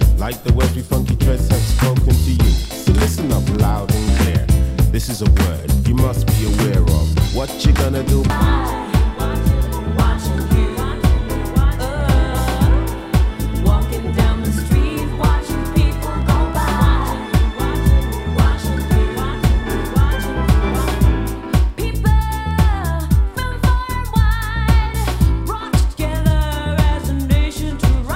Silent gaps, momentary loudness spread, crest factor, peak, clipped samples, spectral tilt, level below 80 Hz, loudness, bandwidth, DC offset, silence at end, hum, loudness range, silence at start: none; 4 LU; 14 dB; 0 dBFS; under 0.1%; -6 dB/octave; -18 dBFS; -17 LUFS; 16.5 kHz; under 0.1%; 0 s; none; 2 LU; 0 s